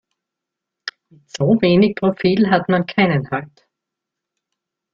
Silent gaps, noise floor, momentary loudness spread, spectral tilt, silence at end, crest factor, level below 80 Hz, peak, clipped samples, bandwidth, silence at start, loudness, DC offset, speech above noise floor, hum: none; -83 dBFS; 18 LU; -7 dB/octave; 1.5 s; 18 dB; -54 dBFS; -2 dBFS; under 0.1%; 7.6 kHz; 0.85 s; -17 LUFS; under 0.1%; 67 dB; none